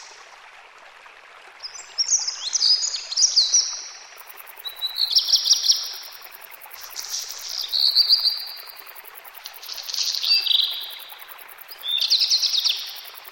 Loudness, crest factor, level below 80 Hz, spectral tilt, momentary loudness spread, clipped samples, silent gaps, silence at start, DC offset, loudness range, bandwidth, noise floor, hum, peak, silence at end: -19 LUFS; 20 dB; -72 dBFS; 6 dB/octave; 23 LU; under 0.1%; none; 0 s; under 0.1%; 4 LU; 17 kHz; -46 dBFS; none; -4 dBFS; 0 s